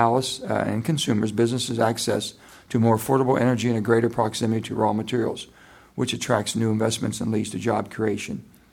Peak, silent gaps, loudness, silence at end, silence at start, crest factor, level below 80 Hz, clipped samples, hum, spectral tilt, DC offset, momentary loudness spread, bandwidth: -4 dBFS; none; -24 LUFS; 0.3 s; 0 s; 20 dB; -58 dBFS; under 0.1%; none; -5.5 dB/octave; under 0.1%; 8 LU; 18 kHz